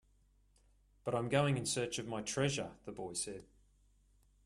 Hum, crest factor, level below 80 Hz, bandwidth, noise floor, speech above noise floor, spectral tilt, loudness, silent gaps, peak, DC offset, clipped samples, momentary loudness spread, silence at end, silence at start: none; 20 dB; -66 dBFS; 13.5 kHz; -70 dBFS; 33 dB; -4.5 dB/octave; -37 LUFS; none; -18 dBFS; under 0.1%; under 0.1%; 13 LU; 1 s; 1.05 s